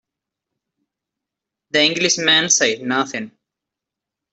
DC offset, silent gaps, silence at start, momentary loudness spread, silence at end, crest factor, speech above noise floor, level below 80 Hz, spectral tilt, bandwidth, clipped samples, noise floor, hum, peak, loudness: under 0.1%; none; 1.75 s; 13 LU; 1.05 s; 20 dB; 67 dB; -68 dBFS; -1 dB/octave; 8.4 kHz; under 0.1%; -85 dBFS; none; -2 dBFS; -16 LUFS